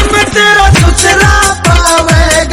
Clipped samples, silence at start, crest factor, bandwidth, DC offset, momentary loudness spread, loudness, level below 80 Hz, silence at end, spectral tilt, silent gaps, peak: 0.7%; 0 s; 6 dB; 16.5 kHz; under 0.1%; 2 LU; -6 LUFS; -14 dBFS; 0 s; -3.5 dB/octave; none; 0 dBFS